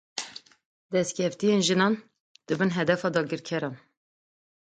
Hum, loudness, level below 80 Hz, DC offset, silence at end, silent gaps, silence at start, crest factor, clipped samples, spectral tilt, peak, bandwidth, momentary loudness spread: none; -27 LUFS; -70 dBFS; under 0.1%; 0.9 s; 0.65-0.89 s, 2.20-2.35 s; 0.15 s; 18 dB; under 0.1%; -4.5 dB/octave; -10 dBFS; 9.4 kHz; 13 LU